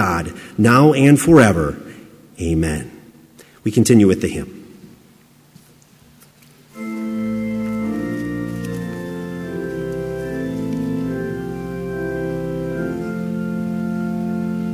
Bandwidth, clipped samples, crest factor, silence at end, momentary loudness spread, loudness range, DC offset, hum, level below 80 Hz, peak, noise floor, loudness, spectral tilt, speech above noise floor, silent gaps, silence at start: 16 kHz; under 0.1%; 20 dB; 0 s; 16 LU; 11 LU; under 0.1%; none; -40 dBFS; 0 dBFS; -50 dBFS; -19 LUFS; -6.5 dB/octave; 36 dB; none; 0 s